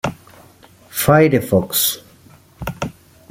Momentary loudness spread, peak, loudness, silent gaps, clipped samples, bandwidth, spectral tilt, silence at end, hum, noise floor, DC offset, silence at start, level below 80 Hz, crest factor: 18 LU; -2 dBFS; -16 LUFS; none; under 0.1%; 16.5 kHz; -4.5 dB/octave; 0.4 s; none; -47 dBFS; under 0.1%; 0.05 s; -46 dBFS; 18 dB